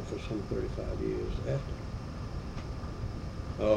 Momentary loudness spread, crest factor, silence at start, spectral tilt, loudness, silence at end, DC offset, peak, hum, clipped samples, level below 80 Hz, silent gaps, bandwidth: 6 LU; 20 dB; 0 s; -7.5 dB/octave; -37 LUFS; 0 s; under 0.1%; -14 dBFS; none; under 0.1%; -40 dBFS; none; 11 kHz